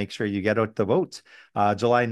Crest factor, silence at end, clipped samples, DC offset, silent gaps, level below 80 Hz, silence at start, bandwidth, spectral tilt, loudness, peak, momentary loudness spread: 16 dB; 0 s; under 0.1%; under 0.1%; none; -68 dBFS; 0 s; 12 kHz; -6.5 dB/octave; -24 LUFS; -8 dBFS; 12 LU